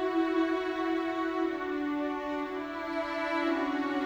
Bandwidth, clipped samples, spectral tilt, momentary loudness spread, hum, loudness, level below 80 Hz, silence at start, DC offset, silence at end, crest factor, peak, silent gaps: over 20 kHz; under 0.1%; -5 dB/octave; 6 LU; none; -31 LUFS; -62 dBFS; 0 s; under 0.1%; 0 s; 14 dB; -18 dBFS; none